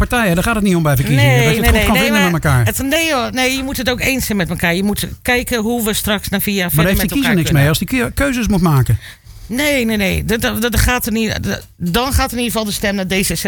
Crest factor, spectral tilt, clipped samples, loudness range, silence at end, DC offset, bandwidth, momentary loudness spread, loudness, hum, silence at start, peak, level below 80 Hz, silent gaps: 14 dB; -4.5 dB/octave; under 0.1%; 3 LU; 0 s; under 0.1%; 19.5 kHz; 6 LU; -15 LUFS; none; 0 s; -2 dBFS; -26 dBFS; none